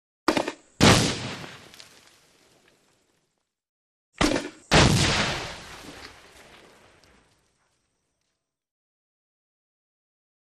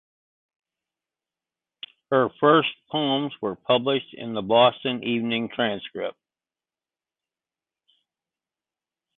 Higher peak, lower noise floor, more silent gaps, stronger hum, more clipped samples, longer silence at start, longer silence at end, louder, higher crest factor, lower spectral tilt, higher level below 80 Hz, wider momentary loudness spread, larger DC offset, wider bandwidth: about the same, -4 dBFS vs -6 dBFS; second, -80 dBFS vs under -90 dBFS; first, 3.69-4.12 s vs none; neither; neither; second, 0.3 s vs 2.1 s; first, 4.4 s vs 3.05 s; about the same, -22 LUFS vs -23 LUFS; about the same, 24 dB vs 22 dB; second, -4 dB/octave vs -9.5 dB/octave; first, -42 dBFS vs -68 dBFS; first, 24 LU vs 14 LU; neither; first, 14.5 kHz vs 4.2 kHz